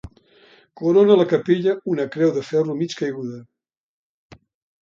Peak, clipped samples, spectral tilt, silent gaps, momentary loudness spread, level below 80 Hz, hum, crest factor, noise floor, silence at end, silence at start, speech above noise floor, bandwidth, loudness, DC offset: -2 dBFS; under 0.1%; -7 dB/octave; none; 13 LU; -58 dBFS; none; 18 dB; -53 dBFS; 1.4 s; 0.05 s; 34 dB; 7.4 kHz; -19 LUFS; under 0.1%